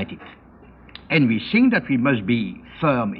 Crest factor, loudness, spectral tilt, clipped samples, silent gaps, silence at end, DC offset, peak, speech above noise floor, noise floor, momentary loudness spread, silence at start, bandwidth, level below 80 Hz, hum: 18 dB; -20 LUFS; -10 dB/octave; under 0.1%; none; 0 s; under 0.1%; -4 dBFS; 28 dB; -47 dBFS; 13 LU; 0 s; 5 kHz; -52 dBFS; none